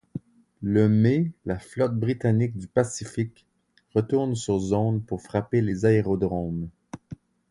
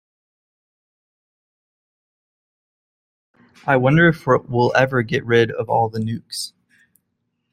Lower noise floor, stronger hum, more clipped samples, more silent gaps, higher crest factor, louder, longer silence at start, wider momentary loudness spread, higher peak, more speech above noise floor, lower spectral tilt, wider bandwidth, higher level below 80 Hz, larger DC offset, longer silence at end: second, -45 dBFS vs -73 dBFS; neither; neither; neither; about the same, 18 dB vs 20 dB; second, -25 LUFS vs -18 LUFS; second, 0.15 s vs 3.65 s; first, 18 LU vs 14 LU; second, -6 dBFS vs -2 dBFS; second, 21 dB vs 56 dB; first, -7.5 dB/octave vs -6 dB/octave; second, 11.5 kHz vs 14.5 kHz; about the same, -50 dBFS vs -54 dBFS; neither; second, 0.35 s vs 1.05 s